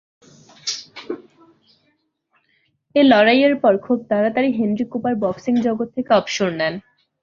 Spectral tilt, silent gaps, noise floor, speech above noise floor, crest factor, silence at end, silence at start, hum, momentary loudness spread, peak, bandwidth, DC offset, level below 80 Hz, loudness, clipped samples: -5 dB/octave; none; -67 dBFS; 49 dB; 18 dB; 0.4 s; 0.65 s; none; 17 LU; -2 dBFS; 7.4 kHz; under 0.1%; -62 dBFS; -18 LUFS; under 0.1%